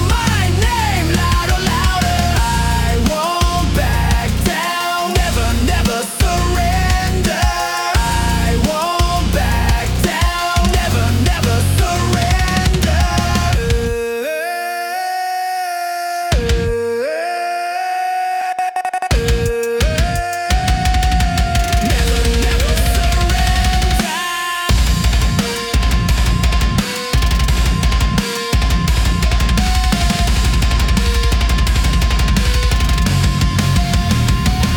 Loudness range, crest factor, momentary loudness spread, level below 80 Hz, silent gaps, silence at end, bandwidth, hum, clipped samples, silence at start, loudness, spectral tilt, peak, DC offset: 3 LU; 12 dB; 4 LU; -18 dBFS; none; 0 s; 18.5 kHz; none; under 0.1%; 0 s; -16 LUFS; -4.5 dB/octave; -2 dBFS; under 0.1%